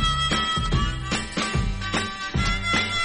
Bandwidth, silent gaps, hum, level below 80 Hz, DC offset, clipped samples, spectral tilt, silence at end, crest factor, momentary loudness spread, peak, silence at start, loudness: 10.5 kHz; none; none; -30 dBFS; under 0.1%; under 0.1%; -3.5 dB/octave; 0 s; 14 dB; 5 LU; -10 dBFS; 0 s; -24 LUFS